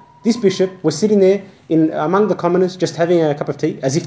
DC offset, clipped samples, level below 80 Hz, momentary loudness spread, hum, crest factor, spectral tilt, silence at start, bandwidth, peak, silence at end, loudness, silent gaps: under 0.1%; under 0.1%; -62 dBFS; 6 LU; none; 16 dB; -6 dB/octave; 0.25 s; 8 kHz; 0 dBFS; 0 s; -16 LUFS; none